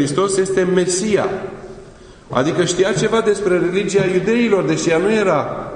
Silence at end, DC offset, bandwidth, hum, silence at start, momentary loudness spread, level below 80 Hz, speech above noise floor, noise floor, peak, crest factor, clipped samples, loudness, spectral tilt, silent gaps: 0 s; under 0.1%; 10.5 kHz; none; 0 s; 7 LU; -46 dBFS; 24 dB; -40 dBFS; 0 dBFS; 16 dB; under 0.1%; -17 LUFS; -5 dB/octave; none